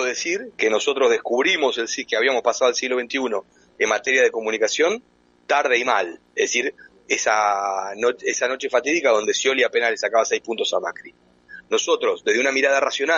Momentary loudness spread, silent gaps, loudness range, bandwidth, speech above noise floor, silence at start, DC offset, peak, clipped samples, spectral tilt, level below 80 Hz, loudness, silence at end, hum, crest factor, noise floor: 6 LU; none; 1 LU; 7.8 kHz; 24 dB; 0 s; under 0.1%; -4 dBFS; under 0.1%; -1 dB/octave; -68 dBFS; -20 LUFS; 0 s; none; 16 dB; -45 dBFS